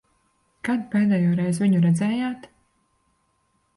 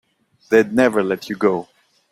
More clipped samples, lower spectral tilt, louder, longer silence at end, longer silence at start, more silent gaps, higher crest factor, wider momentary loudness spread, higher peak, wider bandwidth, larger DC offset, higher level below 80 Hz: neither; first, -7.5 dB/octave vs -6 dB/octave; second, -22 LUFS vs -18 LUFS; first, 1.35 s vs 0.5 s; first, 0.65 s vs 0.5 s; neither; second, 12 dB vs 18 dB; first, 11 LU vs 7 LU; second, -12 dBFS vs -2 dBFS; second, 11.5 kHz vs 15.5 kHz; neither; about the same, -62 dBFS vs -58 dBFS